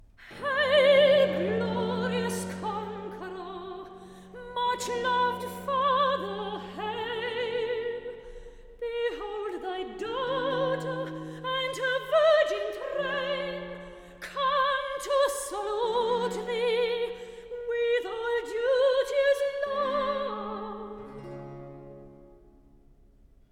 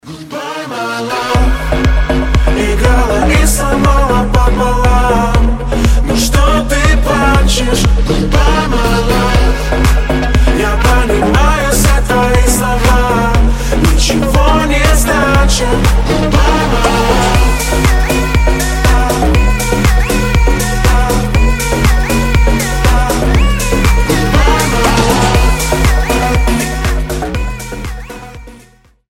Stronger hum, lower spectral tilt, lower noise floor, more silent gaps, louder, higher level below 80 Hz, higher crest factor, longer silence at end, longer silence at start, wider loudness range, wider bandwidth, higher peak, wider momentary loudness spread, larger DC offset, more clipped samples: neither; about the same, -4 dB/octave vs -5 dB/octave; first, -57 dBFS vs -44 dBFS; neither; second, -28 LUFS vs -11 LUFS; second, -58 dBFS vs -12 dBFS; first, 18 dB vs 10 dB; first, 1.15 s vs 0.55 s; first, 0.2 s vs 0.05 s; first, 6 LU vs 1 LU; about the same, 17 kHz vs 16.5 kHz; second, -10 dBFS vs 0 dBFS; first, 18 LU vs 4 LU; neither; neither